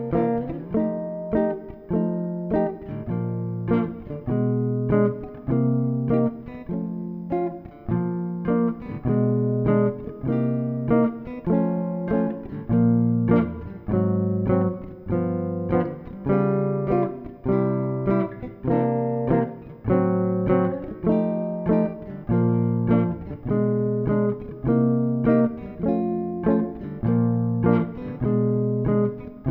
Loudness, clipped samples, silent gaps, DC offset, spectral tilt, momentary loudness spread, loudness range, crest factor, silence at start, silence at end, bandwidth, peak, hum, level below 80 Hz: -24 LUFS; under 0.1%; none; under 0.1%; -13 dB/octave; 9 LU; 3 LU; 16 dB; 0 s; 0 s; 4 kHz; -6 dBFS; none; -46 dBFS